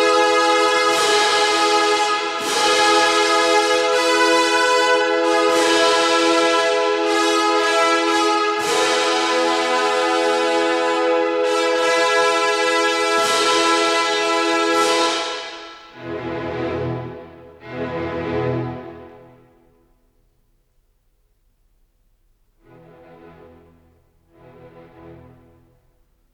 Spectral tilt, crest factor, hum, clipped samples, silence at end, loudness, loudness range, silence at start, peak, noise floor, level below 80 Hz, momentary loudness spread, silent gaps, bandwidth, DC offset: -2.5 dB/octave; 14 dB; none; under 0.1%; 1.2 s; -17 LUFS; 12 LU; 0 s; -4 dBFS; -62 dBFS; -60 dBFS; 12 LU; none; 15 kHz; under 0.1%